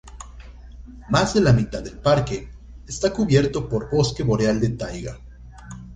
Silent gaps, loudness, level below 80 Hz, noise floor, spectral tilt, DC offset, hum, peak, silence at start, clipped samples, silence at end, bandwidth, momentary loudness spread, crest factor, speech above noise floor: none; -21 LUFS; -38 dBFS; -40 dBFS; -6 dB/octave; under 0.1%; none; -4 dBFS; 0.05 s; under 0.1%; 0 s; 9.6 kHz; 23 LU; 18 dB; 20 dB